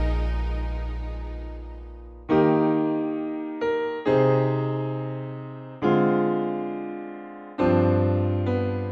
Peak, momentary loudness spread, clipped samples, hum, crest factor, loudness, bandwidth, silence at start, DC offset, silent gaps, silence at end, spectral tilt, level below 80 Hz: -8 dBFS; 17 LU; under 0.1%; none; 16 dB; -24 LUFS; 6.4 kHz; 0 s; under 0.1%; none; 0 s; -10 dB/octave; -34 dBFS